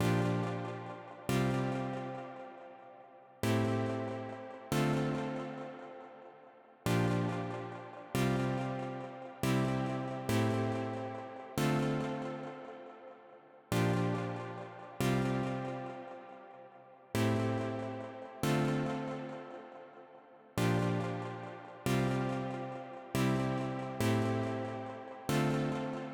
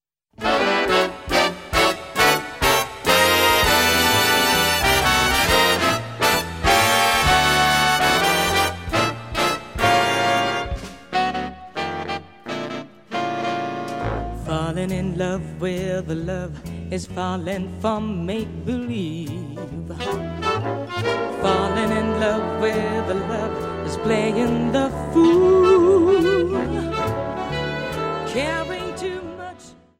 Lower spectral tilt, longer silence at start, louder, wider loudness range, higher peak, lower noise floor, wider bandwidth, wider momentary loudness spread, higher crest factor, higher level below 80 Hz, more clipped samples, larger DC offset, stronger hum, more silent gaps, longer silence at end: first, -6.5 dB/octave vs -3.5 dB/octave; second, 0 s vs 0.4 s; second, -35 LUFS vs -20 LUFS; second, 3 LU vs 10 LU; second, -20 dBFS vs -2 dBFS; first, -58 dBFS vs -43 dBFS; first, over 20 kHz vs 16 kHz; first, 18 LU vs 14 LU; about the same, 16 dB vs 18 dB; second, -62 dBFS vs -38 dBFS; neither; second, under 0.1% vs 0.2%; neither; neither; second, 0 s vs 0.25 s